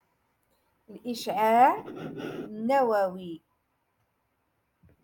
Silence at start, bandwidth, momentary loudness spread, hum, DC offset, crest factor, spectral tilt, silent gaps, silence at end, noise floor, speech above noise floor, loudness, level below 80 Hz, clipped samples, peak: 0.9 s; 17.5 kHz; 20 LU; none; under 0.1%; 20 dB; -5 dB/octave; none; 1.65 s; -75 dBFS; 49 dB; -26 LUFS; -74 dBFS; under 0.1%; -10 dBFS